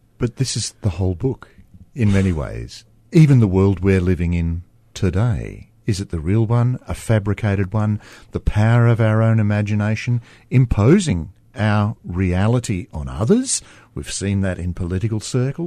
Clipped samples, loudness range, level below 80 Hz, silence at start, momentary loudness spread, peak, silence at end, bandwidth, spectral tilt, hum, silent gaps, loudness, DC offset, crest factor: under 0.1%; 4 LU; -34 dBFS; 0.2 s; 13 LU; -2 dBFS; 0 s; 11.5 kHz; -6.5 dB/octave; none; none; -19 LUFS; under 0.1%; 16 dB